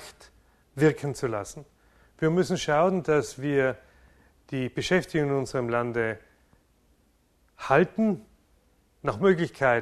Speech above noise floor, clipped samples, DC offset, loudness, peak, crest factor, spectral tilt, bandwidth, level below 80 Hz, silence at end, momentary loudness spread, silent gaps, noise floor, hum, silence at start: 40 dB; under 0.1%; under 0.1%; -26 LUFS; -6 dBFS; 22 dB; -6 dB/octave; 13.5 kHz; -56 dBFS; 0 s; 14 LU; none; -65 dBFS; none; 0 s